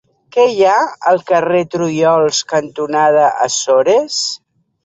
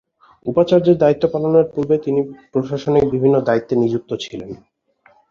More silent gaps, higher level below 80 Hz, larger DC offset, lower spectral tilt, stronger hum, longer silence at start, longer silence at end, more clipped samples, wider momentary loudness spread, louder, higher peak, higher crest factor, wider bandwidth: neither; second, -62 dBFS vs -50 dBFS; neither; second, -3.5 dB/octave vs -8 dB/octave; neither; about the same, 0.35 s vs 0.45 s; second, 0.5 s vs 0.75 s; neither; second, 7 LU vs 14 LU; first, -13 LUFS vs -17 LUFS; about the same, -2 dBFS vs -2 dBFS; about the same, 12 dB vs 16 dB; first, 8.4 kHz vs 7.4 kHz